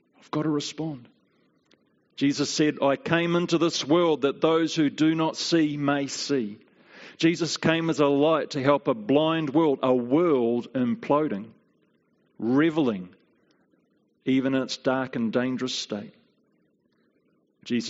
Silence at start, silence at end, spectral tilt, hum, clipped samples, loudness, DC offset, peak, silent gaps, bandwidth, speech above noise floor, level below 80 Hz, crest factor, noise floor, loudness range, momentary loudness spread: 0.35 s; 0 s; -4.5 dB/octave; none; under 0.1%; -25 LUFS; under 0.1%; -4 dBFS; none; 8 kHz; 44 dB; -70 dBFS; 20 dB; -68 dBFS; 5 LU; 10 LU